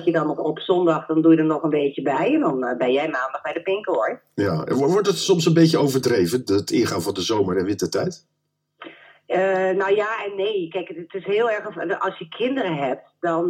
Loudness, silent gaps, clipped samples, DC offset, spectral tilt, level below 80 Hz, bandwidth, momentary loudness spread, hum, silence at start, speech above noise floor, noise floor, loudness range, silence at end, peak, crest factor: -21 LUFS; none; under 0.1%; under 0.1%; -5.5 dB/octave; -66 dBFS; 16.5 kHz; 9 LU; none; 0 s; 35 dB; -56 dBFS; 5 LU; 0 s; -4 dBFS; 18 dB